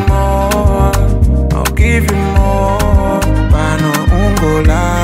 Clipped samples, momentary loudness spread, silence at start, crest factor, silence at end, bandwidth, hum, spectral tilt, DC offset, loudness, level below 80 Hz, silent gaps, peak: under 0.1%; 2 LU; 0 s; 10 dB; 0 s; 16.5 kHz; none; -6 dB/octave; under 0.1%; -12 LUFS; -14 dBFS; none; 0 dBFS